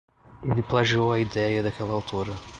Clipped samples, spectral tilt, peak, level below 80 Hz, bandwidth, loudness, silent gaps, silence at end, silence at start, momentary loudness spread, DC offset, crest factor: under 0.1%; -6.5 dB/octave; -8 dBFS; -48 dBFS; 8.8 kHz; -25 LUFS; none; 0 s; 0.3 s; 9 LU; under 0.1%; 18 dB